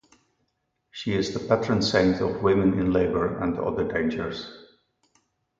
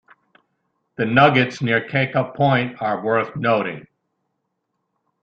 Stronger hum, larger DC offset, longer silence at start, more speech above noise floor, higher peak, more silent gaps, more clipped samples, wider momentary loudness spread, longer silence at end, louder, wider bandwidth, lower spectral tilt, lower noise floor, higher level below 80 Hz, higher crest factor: neither; neither; about the same, 0.95 s vs 1 s; second, 51 dB vs 56 dB; second, -6 dBFS vs -2 dBFS; neither; neither; first, 12 LU vs 9 LU; second, 0.95 s vs 1.4 s; second, -24 LUFS vs -19 LUFS; about the same, 7.8 kHz vs 7.8 kHz; about the same, -6 dB/octave vs -7 dB/octave; about the same, -75 dBFS vs -75 dBFS; first, -48 dBFS vs -60 dBFS; about the same, 20 dB vs 20 dB